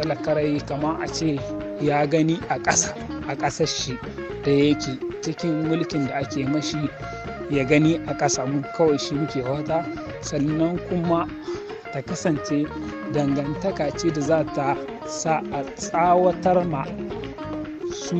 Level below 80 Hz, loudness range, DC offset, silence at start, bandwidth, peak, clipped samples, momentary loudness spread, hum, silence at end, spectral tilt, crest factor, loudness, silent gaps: -48 dBFS; 3 LU; under 0.1%; 0 s; 8.6 kHz; -4 dBFS; under 0.1%; 12 LU; none; 0 s; -5 dB/octave; 20 dB; -24 LUFS; none